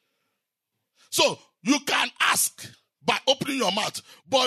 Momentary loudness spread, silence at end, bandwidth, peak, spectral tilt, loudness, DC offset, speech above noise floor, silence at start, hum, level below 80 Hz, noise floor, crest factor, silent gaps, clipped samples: 11 LU; 0 s; 13.5 kHz; -8 dBFS; -1.5 dB/octave; -24 LUFS; under 0.1%; 57 dB; 1.1 s; none; -80 dBFS; -82 dBFS; 18 dB; none; under 0.1%